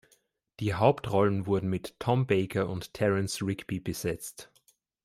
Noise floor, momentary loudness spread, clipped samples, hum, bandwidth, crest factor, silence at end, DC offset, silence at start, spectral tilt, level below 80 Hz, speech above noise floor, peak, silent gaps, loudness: -69 dBFS; 9 LU; under 0.1%; none; 16 kHz; 22 dB; 0.6 s; under 0.1%; 0.6 s; -6 dB/octave; -60 dBFS; 41 dB; -8 dBFS; none; -29 LUFS